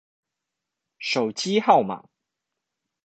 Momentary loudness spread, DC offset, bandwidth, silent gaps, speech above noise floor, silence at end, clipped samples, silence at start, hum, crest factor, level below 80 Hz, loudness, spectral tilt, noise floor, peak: 14 LU; under 0.1%; 9 kHz; none; 63 dB; 1.05 s; under 0.1%; 1 s; none; 24 dB; -74 dBFS; -22 LUFS; -4 dB/octave; -84 dBFS; -2 dBFS